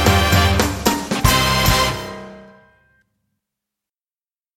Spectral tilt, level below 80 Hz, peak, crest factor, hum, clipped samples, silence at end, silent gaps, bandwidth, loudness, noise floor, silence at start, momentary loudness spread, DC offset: -4 dB/octave; -28 dBFS; 0 dBFS; 18 dB; none; under 0.1%; 2.1 s; none; 17 kHz; -16 LUFS; under -90 dBFS; 0 s; 13 LU; under 0.1%